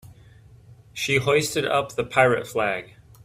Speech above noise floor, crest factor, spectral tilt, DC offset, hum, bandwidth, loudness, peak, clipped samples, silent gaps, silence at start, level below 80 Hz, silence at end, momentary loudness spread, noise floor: 27 dB; 22 dB; -4 dB/octave; under 0.1%; none; 16 kHz; -22 LUFS; -4 dBFS; under 0.1%; none; 0.05 s; -56 dBFS; 0.4 s; 10 LU; -50 dBFS